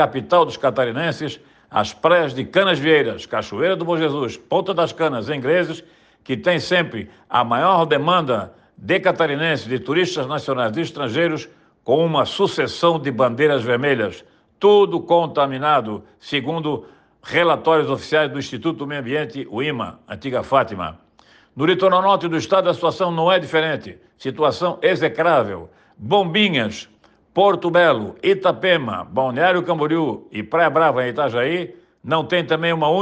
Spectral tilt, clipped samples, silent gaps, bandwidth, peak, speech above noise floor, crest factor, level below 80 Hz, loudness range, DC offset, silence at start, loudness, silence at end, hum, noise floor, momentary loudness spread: -5.5 dB/octave; under 0.1%; none; 9 kHz; -4 dBFS; 34 dB; 16 dB; -62 dBFS; 3 LU; under 0.1%; 0 s; -19 LUFS; 0 s; none; -53 dBFS; 11 LU